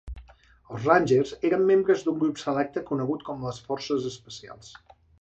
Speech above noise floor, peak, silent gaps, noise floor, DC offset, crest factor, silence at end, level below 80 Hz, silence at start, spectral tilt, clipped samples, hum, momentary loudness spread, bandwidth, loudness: 29 dB; -6 dBFS; none; -54 dBFS; under 0.1%; 20 dB; 0.5 s; -52 dBFS; 0.05 s; -6 dB/octave; under 0.1%; none; 21 LU; 8.2 kHz; -25 LUFS